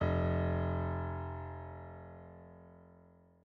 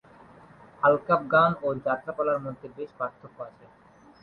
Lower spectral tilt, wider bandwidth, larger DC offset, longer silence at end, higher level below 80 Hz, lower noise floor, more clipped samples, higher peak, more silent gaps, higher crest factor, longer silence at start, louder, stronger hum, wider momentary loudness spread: about the same, -8 dB/octave vs -8.5 dB/octave; second, 4.8 kHz vs 5.4 kHz; neither; second, 0.45 s vs 0.7 s; first, -56 dBFS vs -66 dBFS; first, -62 dBFS vs -52 dBFS; neither; second, -20 dBFS vs -8 dBFS; neither; about the same, 16 dB vs 20 dB; second, 0 s vs 0.8 s; second, -37 LUFS vs -25 LUFS; neither; about the same, 22 LU vs 21 LU